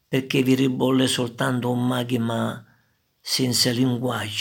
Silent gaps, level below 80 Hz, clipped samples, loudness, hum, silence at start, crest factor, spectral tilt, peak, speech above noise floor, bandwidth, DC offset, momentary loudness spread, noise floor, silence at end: none; -68 dBFS; under 0.1%; -22 LUFS; none; 0.1 s; 16 dB; -4.5 dB/octave; -6 dBFS; 43 dB; 17.5 kHz; under 0.1%; 7 LU; -65 dBFS; 0 s